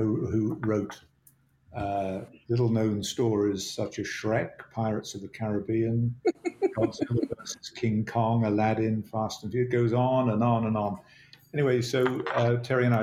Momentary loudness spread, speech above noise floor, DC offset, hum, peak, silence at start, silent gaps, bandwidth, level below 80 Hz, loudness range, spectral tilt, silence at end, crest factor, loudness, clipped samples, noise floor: 10 LU; 36 dB; under 0.1%; none; -12 dBFS; 0 s; none; 14.5 kHz; -60 dBFS; 3 LU; -6.5 dB/octave; 0 s; 16 dB; -28 LUFS; under 0.1%; -63 dBFS